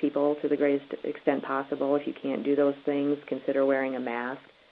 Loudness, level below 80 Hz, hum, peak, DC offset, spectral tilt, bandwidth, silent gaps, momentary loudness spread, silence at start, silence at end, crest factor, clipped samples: -28 LUFS; -78 dBFS; none; -10 dBFS; under 0.1%; -9 dB/octave; 4.8 kHz; none; 7 LU; 0 s; 0.3 s; 18 dB; under 0.1%